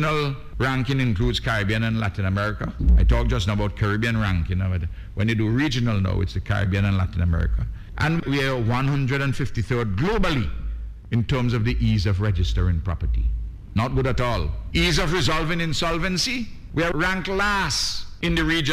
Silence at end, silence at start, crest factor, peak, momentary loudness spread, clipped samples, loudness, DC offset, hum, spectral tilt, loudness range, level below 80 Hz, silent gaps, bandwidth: 0 s; 0 s; 12 dB; -10 dBFS; 6 LU; under 0.1%; -23 LUFS; under 0.1%; none; -5.5 dB/octave; 1 LU; -28 dBFS; none; 15 kHz